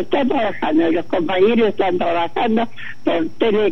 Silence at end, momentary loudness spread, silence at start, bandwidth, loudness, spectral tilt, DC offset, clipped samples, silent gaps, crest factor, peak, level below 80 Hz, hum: 0 s; 5 LU; 0 s; 6.2 kHz; -18 LUFS; -7 dB/octave; 5%; under 0.1%; none; 14 dB; -4 dBFS; -58 dBFS; none